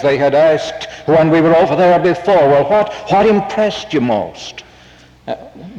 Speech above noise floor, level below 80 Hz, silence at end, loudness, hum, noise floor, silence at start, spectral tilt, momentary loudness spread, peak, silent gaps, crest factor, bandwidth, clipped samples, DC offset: 30 dB; -46 dBFS; 0 s; -12 LUFS; none; -43 dBFS; 0 s; -6.5 dB/octave; 17 LU; -4 dBFS; none; 10 dB; 9 kHz; under 0.1%; under 0.1%